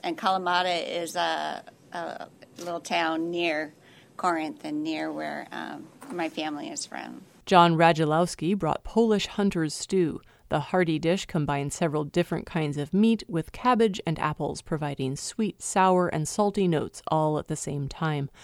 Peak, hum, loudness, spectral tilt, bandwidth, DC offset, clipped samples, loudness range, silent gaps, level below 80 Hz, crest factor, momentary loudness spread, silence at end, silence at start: -4 dBFS; none; -27 LUFS; -5 dB/octave; 15.5 kHz; under 0.1%; under 0.1%; 7 LU; none; -54 dBFS; 22 dB; 14 LU; 0 s; 0.05 s